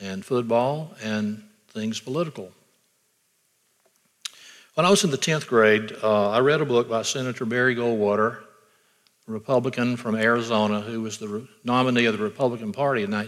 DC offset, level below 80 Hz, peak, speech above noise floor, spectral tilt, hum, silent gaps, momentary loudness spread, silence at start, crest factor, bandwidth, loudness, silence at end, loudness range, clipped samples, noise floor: under 0.1%; -74 dBFS; -6 dBFS; 45 dB; -4.5 dB/octave; none; none; 15 LU; 0 s; 18 dB; 15 kHz; -23 LUFS; 0 s; 11 LU; under 0.1%; -68 dBFS